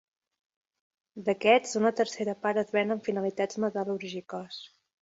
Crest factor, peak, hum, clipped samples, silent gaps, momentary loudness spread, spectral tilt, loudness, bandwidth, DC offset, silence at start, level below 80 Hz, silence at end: 20 dB; -8 dBFS; none; under 0.1%; none; 15 LU; -4.5 dB/octave; -29 LUFS; 8 kHz; under 0.1%; 1.15 s; -76 dBFS; 0.35 s